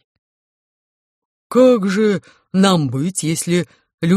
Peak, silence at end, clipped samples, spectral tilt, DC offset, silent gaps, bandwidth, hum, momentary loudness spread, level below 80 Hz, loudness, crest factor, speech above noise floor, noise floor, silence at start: -2 dBFS; 0 s; under 0.1%; -5.5 dB/octave; under 0.1%; 3.94-3.98 s; 14 kHz; none; 10 LU; -58 dBFS; -17 LUFS; 16 dB; over 74 dB; under -90 dBFS; 1.5 s